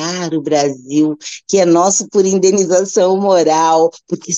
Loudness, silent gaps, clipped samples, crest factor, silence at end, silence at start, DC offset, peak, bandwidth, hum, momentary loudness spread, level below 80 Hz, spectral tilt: -13 LUFS; none; under 0.1%; 12 dB; 0 s; 0 s; under 0.1%; -2 dBFS; 8.6 kHz; none; 7 LU; -64 dBFS; -4 dB/octave